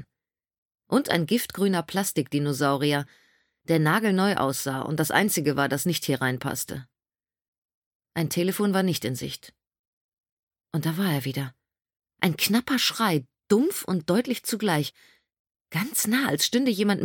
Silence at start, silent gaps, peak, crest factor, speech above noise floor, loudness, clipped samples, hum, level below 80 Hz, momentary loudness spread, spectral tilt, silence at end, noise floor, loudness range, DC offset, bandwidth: 0 s; 0.58-0.71 s, 7.48-8.00 s, 9.79-10.23 s, 10.32-10.47 s, 15.40-15.45 s, 15.61-15.65 s; -4 dBFS; 22 dB; over 65 dB; -25 LUFS; under 0.1%; none; -66 dBFS; 9 LU; -4.5 dB/octave; 0 s; under -90 dBFS; 5 LU; under 0.1%; 17.5 kHz